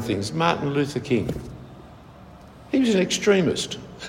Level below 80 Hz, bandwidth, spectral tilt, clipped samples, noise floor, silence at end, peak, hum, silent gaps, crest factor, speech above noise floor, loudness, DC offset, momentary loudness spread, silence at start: -50 dBFS; 16 kHz; -5 dB/octave; under 0.1%; -45 dBFS; 0 s; -6 dBFS; none; none; 18 dB; 22 dB; -23 LUFS; under 0.1%; 16 LU; 0 s